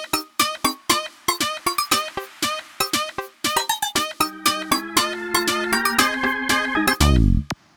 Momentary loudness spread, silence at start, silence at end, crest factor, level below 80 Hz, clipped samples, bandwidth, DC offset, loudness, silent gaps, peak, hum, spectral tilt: 7 LU; 0 s; 0.25 s; 20 dB; -30 dBFS; under 0.1%; over 20 kHz; under 0.1%; -21 LUFS; none; -2 dBFS; none; -3 dB/octave